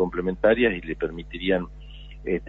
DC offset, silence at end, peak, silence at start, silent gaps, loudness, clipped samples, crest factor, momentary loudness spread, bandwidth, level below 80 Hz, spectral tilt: under 0.1%; 0 s; -6 dBFS; 0 s; none; -24 LUFS; under 0.1%; 18 dB; 19 LU; 4.1 kHz; -42 dBFS; -8.5 dB/octave